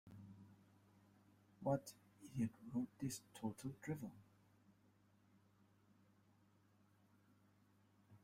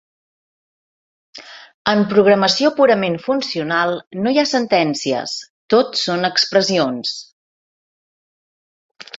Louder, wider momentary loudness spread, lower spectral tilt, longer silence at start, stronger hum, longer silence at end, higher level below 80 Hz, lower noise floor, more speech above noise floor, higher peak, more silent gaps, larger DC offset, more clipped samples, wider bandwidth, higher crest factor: second, -47 LUFS vs -17 LUFS; first, 20 LU vs 11 LU; first, -6.5 dB/octave vs -4 dB/octave; second, 0.05 s vs 1.35 s; first, 50 Hz at -70 dBFS vs none; about the same, 0.05 s vs 0 s; second, -80 dBFS vs -62 dBFS; second, -75 dBFS vs under -90 dBFS; second, 28 dB vs over 74 dB; second, -28 dBFS vs 0 dBFS; second, none vs 1.74-1.85 s, 4.07-4.11 s, 5.50-5.69 s, 7.32-8.95 s; neither; neither; first, 16 kHz vs 8 kHz; first, 24 dB vs 18 dB